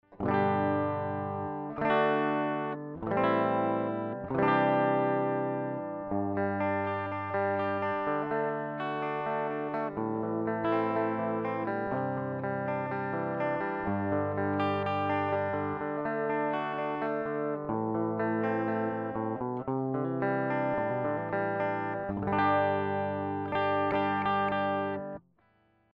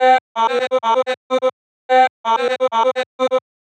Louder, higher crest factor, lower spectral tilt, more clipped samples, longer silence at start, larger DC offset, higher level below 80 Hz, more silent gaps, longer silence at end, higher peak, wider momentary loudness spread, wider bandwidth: second, -31 LUFS vs -18 LUFS; about the same, 18 dB vs 16 dB; first, -9.5 dB/octave vs -2 dB/octave; neither; about the same, 0.1 s vs 0 s; neither; first, -64 dBFS vs under -90 dBFS; second, none vs 0.21-0.35 s, 1.17-1.30 s, 1.53-1.89 s, 2.10-2.24 s, 3.06-3.19 s; first, 0.75 s vs 0.35 s; second, -12 dBFS vs -2 dBFS; about the same, 6 LU vs 5 LU; second, 5.8 kHz vs 9 kHz